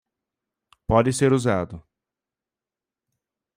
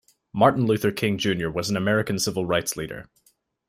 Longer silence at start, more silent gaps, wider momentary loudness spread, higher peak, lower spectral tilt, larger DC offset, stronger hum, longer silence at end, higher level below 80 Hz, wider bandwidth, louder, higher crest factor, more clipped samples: first, 0.9 s vs 0.35 s; neither; about the same, 15 LU vs 13 LU; about the same, -6 dBFS vs -4 dBFS; about the same, -6 dB/octave vs -5 dB/octave; neither; neither; first, 1.75 s vs 0.65 s; first, -46 dBFS vs -56 dBFS; about the same, 15.5 kHz vs 16 kHz; about the same, -21 LUFS vs -23 LUFS; about the same, 20 dB vs 20 dB; neither